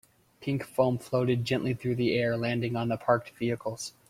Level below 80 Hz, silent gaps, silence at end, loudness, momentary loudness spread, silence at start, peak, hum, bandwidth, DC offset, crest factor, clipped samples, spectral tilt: -64 dBFS; none; 0.2 s; -29 LUFS; 7 LU; 0.4 s; -8 dBFS; none; 15.5 kHz; under 0.1%; 20 dB; under 0.1%; -6.5 dB/octave